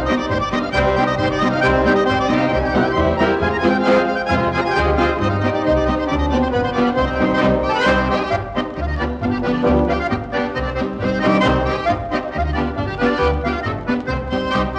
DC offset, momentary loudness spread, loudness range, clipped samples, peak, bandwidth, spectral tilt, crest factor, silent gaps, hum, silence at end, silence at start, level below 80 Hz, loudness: under 0.1%; 6 LU; 3 LU; under 0.1%; -2 dBFS; 9.2 kHz; -7 dB/octave; 14 dB; none; none; 0 s; 0 s; -30 dBFS; -18 LUFS